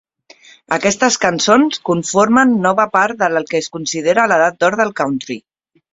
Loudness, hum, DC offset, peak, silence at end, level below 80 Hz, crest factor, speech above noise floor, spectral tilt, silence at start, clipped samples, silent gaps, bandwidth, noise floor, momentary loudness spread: -14 LUFS; none; under 0.1%; 0 dBFS; 0.55 s; -56 dBFS; 16 dB; 31 dB; -3.5 dB/octave; 0.7 s; under 0.1%; none; 7.8 kHz; -45 dBFS; 9 LU